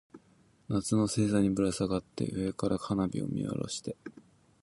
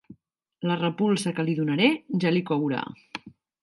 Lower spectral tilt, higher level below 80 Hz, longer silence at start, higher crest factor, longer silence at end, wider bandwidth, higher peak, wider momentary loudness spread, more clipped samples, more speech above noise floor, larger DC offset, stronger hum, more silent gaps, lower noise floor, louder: about the same, -6 dB/octave vs -6 dB/octave; first, -56 dBFS vs -72 dBFS; about the same, 0.15 s vs 0.1 s; about the same, 18 dB vs 20 dB; about the same, 0.4 s vs 0.35 s; about the same, 11.5 kHz vs 11.5 kHz; second, -14 dBFS vs -6 dBFS; second, 10 LU vs 15 LU; neither; second, 34 dB vs 38 dB; neither; neither; neither; about the same, -64 dBFS vs -62 dBFS; second, -31 LUFS vs -25 LUFS